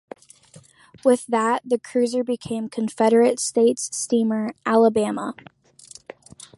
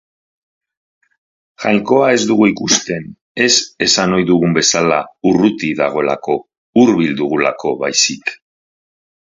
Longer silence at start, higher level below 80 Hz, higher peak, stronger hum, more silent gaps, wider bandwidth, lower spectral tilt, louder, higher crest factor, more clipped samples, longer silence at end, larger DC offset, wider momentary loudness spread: second, 0.55 s vs 1.6 s; second, -66 dBFS vs -52 dBFS; second, -4 dBFS vs 0 dBFS; neither; second, none vs 3.21-3.35 s, 6.57-6.73 s; first, 11.5 kHz vs 7.8 kHz; about the same, -4.5 dB/octave vs -3.5 dB/octave; second, -21 LUFS vs -14 LUFS; about the same, 18 dB vs 16 dB; neither; first, 1.25 s vs 0.95 s; neither; first, 15 LU vs 9 LU